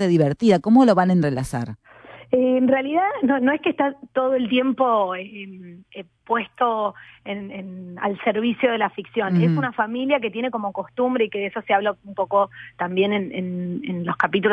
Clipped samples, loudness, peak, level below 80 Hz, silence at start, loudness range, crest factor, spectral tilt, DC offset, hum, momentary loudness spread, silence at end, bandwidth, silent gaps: under 0.1%; -21 LUFS; -4 dBFS; -58 dBFS; 0 s; 5 LU; 18 dB; -7 dB/octave; under 0.1%; none; 15 LU; 0 s; 11 kHz; none